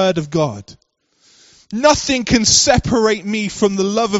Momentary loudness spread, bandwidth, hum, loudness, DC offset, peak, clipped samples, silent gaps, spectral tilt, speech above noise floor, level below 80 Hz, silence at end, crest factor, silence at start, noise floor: 11 LU; 8.2 kHz; none; -15 LUFS; under 0.1%; 0 dBFS; under 0.1%; none; -3.5 dB/octave; 42 dB; -38 dBFS; 0 s; 16 dB; 0 s; -58 dBFS